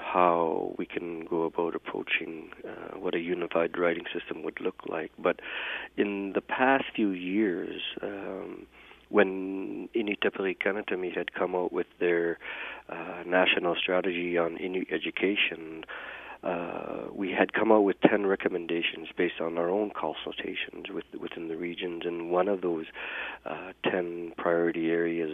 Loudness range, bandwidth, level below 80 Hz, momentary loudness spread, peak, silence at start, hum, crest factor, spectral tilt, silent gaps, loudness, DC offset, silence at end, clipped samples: 5 LU; 3.9 kHz; -66 dBFS; 13 LU; -2 dBFS; 0 s; none; 28 dB; -7.5 dB/octave; none; -30 LUFS; under 0.1%; 0 s; under 0.1%